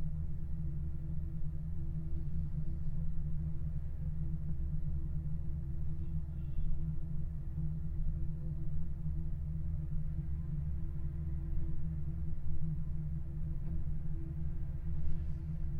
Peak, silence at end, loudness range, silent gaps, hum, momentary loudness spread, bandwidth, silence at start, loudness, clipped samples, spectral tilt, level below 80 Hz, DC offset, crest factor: -20 dBFS; 0 s; 1 LU; none; none; 2 LU; 2 kHz; 0 s; -41 LUFS; under 0.1%; -11 dB/octave; -38 dBFS; under 0.1%; 14 dB